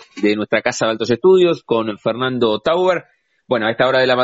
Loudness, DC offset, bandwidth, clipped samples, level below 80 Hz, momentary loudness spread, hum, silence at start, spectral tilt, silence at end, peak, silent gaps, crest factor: -17 LUFS; under 0.1%; 8 kHz; under 0.1%; -58 dBFS; 7 LU; none; 0.15 s; -3.5 dB/octave; 0 s; -4 dBFS; none; 14 dB